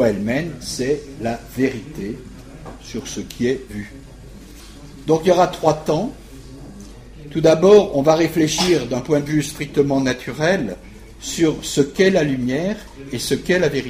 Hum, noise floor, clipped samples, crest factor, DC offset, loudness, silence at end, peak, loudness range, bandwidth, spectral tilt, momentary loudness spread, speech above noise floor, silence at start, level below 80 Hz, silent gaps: none; -39 dBFS; under 0.1%; 18 dB; under 0.1%; -19 LUFS; 0 s; -2 dBFS; 10 LU; 15.5 kHz; -5 dB/octave; 22 LU; 20 dB; 0 s; -42 dBFS; none